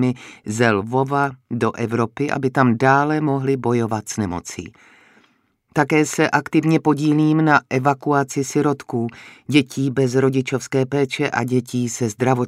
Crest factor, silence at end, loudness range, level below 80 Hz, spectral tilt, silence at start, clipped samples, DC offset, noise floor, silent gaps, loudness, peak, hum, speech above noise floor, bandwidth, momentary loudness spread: 18 dB; 0 s; 4 LU; -60 dBFS; -6 dB/octave; 0 s; under 0.1%; under 0.1%; -61 dBFS; none; -19 LUFS; 0 dBFS; none; 42 dB; 15 kHz; 9 LU